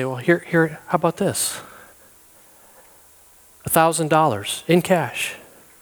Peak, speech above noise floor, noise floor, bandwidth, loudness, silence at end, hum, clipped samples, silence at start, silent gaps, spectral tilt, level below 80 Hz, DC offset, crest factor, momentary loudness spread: -2 dBFS; 31 dB; -51 dBFS; over 20 kHz; -20 LUFS; 0.4 s; none; under 0.1%; 0 s; none; -4.5 dB/octave; -60 dBFS; under 0.1%; 20 dB; 9 LU